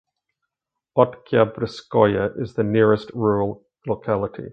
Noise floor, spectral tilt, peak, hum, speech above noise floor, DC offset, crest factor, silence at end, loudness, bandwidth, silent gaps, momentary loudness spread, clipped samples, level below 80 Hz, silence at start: -84 dBFS; -8.5 dB/octave; 0 dBFS; none; 64 dB; under 0.1%; 22 dB; 0 s; -21 LUFS; 7.6 kHz; none; 10 LU; under 0.1%; -52 dBFS; 0.95 s